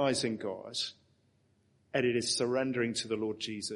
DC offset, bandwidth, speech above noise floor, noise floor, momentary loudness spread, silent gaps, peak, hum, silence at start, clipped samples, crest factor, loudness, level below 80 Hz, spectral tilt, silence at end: under 0.1%; 11.5 kHz; 38 dB; -70 dBFS; 7 LU; none; -16 dBFS; none; 0 s; under 0.1%; 18 dB; -33 LUFS; -74 dBFS; -3.5 dB/octave; 0 s